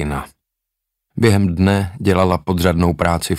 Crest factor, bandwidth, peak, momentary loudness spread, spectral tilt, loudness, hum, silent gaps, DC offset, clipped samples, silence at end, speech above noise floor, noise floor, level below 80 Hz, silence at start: 16 dB; 16 kHz; -2 dBFS; 8 LU; -6.5 dB/octave; -16 LUFS; none; none; under 0.1%; under 0.1%; 0 s; 64 dB; -80 dBFS; -34 dBFS; 0 s